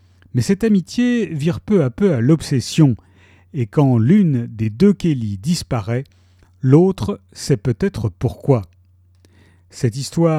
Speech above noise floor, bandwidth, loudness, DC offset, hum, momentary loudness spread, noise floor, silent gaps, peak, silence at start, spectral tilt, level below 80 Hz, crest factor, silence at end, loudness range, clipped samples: 36 dB; 14 kHz; -18 LUFS; under 0.1%; none; 11 LU; -52 dBFS; none; 0 dBFS; 0.35 s; -7.5 dB/octave; -44 dBFS; 18 dB; 0 s; 3 LU; under 0.1%